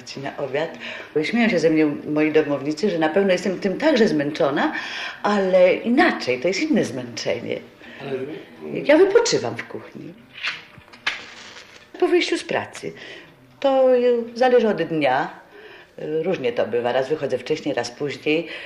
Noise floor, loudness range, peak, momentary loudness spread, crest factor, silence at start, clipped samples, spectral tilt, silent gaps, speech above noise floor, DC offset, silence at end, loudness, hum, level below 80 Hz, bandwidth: -44 dBFS; 6 LU; -4 dBFS; 18 LU; 18 dB; 0 s; under 0.1%; -5 dB/octave; none; 24 dB; under 0.1%; 0 s; -21 LUFS; none; -62 dBFS; 11.5 kHz